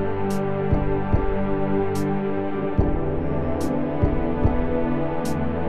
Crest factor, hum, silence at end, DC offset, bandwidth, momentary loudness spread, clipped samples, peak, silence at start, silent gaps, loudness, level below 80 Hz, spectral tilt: 14 dB; none; 0 s; 3%; 13.5 kHz; 2 LU; under 0.1%; -8 dBFS; 0 s; none; -24 LUFS; -30 dBFS; -8 dB/octave